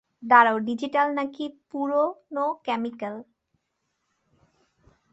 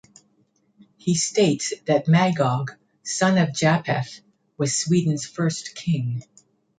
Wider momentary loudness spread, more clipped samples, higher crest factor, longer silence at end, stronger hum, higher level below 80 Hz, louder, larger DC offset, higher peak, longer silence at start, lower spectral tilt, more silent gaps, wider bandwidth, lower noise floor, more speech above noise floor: first, 18 LU vs 11 LU; neither; about the same, 22 dB vs 18 dB; first, 1.9 s vs 0.6 s; neither; second, -74 dBFS vs -64 dBFS; about the same, -24 LUFS vs -22 LUFS; neither; about the same, -4 dBFS vs -4 dBFS; second, 0.2 s vs 1.05 s; about the same, -5.5 dB/octave vs -5 dB/octave; neither; second, 8 kHz vs 9.4 kHz; first, -77 dBFS vs -65 dBFS; first, 53 dB vs 43 dB